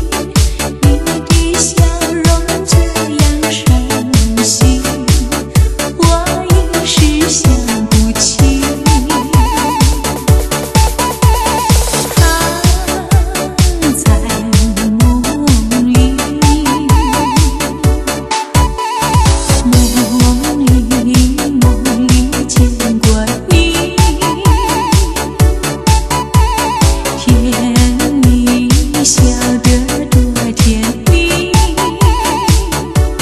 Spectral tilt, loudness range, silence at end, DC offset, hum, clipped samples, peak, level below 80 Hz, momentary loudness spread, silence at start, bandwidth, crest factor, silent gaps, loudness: -4.5 dB/octave; 1 LU; 0 s; under 0.1%; none; under 0.1%; 0 dBFS; -16 dBFS; 4 LU; 0 s; 13.5 kHz; 10 dB; none; -11 LUFS